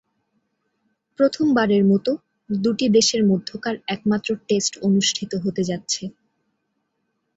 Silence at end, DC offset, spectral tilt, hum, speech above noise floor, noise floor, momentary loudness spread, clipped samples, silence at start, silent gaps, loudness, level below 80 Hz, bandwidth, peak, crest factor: 1.25 s; under 0.1%; -4.5 dB/octave; none; 54 dB; -74 dBFS; 9 LU; under 0.1%; 1.2 s; none; -21 LUFS; -62 dBFS; 8 kHz; -6 dBFS; 16 dB